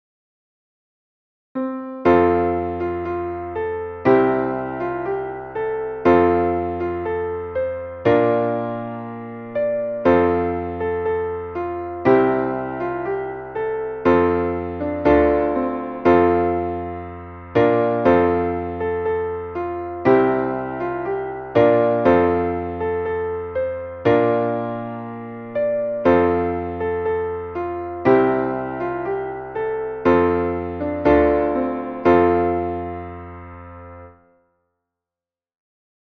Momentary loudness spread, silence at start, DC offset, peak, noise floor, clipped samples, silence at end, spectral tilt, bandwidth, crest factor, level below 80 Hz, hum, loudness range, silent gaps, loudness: 12 LU; 1.55 s; under 0.1%; -4 dBFS; under -90 dBFS; under 0.1%; 2.1 s; -9.5 dB/octave; 6.2 kHz; 18 dB; -44 dBFS; none; 3 LU; none; -20 LUFS